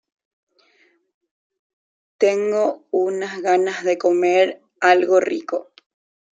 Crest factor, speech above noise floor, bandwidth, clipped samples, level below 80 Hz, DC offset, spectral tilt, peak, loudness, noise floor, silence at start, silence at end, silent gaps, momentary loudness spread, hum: 20 dB; 42 dB; 7.8 kHz; under 0.1%; -76 dBFS; under 0.1%; -4 dB/octave; -2 dBFS; -19 LUFS; -60 dBFS; 2.2 s; 0.75 s; none; 8 LU; none